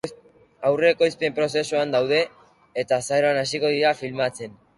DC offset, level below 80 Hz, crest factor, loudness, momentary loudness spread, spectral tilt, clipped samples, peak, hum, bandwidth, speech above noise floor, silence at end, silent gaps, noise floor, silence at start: under 0.1%; -64 dBFS; 18 dB; -22 LUFS; 10 LU; -4 dB/octave; under 0.1%; -6 dBFS; none; 11.5 kHz; 30 dB; 0.25 s; none; -52 dBFS; 0.05 s